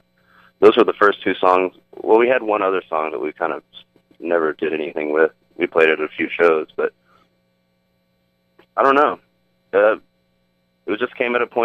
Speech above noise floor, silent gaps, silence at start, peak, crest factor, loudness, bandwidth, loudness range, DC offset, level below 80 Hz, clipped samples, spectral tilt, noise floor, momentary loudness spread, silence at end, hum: 48 dB; none; 0.6 s; 0 dBFS; 20 dB; -18 LUFS; 6.6 kHz; 5 LU; under 0.1%; -66 dBFS; under 0.1%; -6 dB/octave; -65 dBFS; 11 LU; 0 s; none